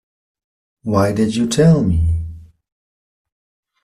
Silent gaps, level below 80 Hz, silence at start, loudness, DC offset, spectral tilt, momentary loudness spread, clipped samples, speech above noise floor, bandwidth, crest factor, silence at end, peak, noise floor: none; -34 dBFS; 0.85 s; -16 LUFS; under 0.1%; -7 dB/octave; 13 LU; under 0.1%; over 76 dB; 12.5 kHz; 16 dB; 1.4 s; -2 dBFS; under -90 dBFS